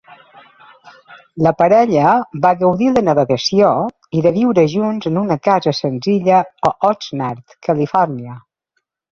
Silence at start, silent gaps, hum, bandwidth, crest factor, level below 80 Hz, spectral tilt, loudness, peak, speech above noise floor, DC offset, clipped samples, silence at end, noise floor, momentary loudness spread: 0.1 s; none; none; 7.4 kHz; 14 dB; -54 dBFS; -6.5 dB/octave; -15 LUFS; 0 dBFS; 56 dB; under 0.1%; under 0.1%; 0.8 s; -71 dBFS; 9 LU